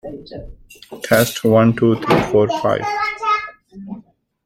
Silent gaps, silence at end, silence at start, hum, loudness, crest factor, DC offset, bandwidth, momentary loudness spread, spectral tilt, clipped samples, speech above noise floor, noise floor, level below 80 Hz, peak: none; 0.45 s; 0.05 s; none; -16 LUFS; 18 dB; under 0.1%; 16.5 kHz; 22 LU; -5.5 dB/octave; under 0.1%; 28 dB; -44 dBFS; -46 dBFS; 0 dBFS